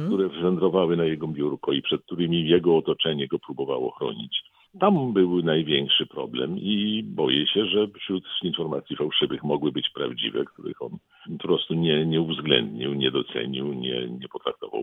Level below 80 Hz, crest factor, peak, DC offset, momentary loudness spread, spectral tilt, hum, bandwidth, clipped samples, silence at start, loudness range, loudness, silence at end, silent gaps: -64 dBFS; 20 dB; -4 dBFS; under 0.1%; 10 LU; -8.5 dB/octave; none; 4 kHz; under 0.1%; 0 s; 3 LU; -25 LUFS; 0 s; none